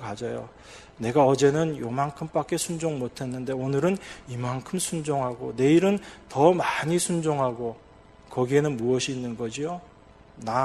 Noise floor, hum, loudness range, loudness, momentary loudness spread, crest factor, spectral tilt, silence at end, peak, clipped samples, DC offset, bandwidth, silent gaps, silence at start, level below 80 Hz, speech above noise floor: -49 dBFS; none; 4 LU; -26 LUFS; 13 LU; 22 dB; -5.5 dB/octave; 0 s; -4 dBFS; under 0.1%; under 0.1%; 13 kHz; none; 0 s; -58 dBFS; 24 dB